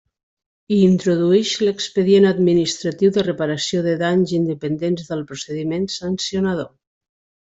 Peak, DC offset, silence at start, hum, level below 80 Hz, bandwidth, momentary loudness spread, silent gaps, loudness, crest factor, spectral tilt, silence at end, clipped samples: -4 dBFS; under 0.1%; 0.7 s; none; -58 dBFS; 8 kHz; 10 LU; none; -19 LUFS; 16 dB; -5.5 dB/octave; 0.8 s; under 0.1%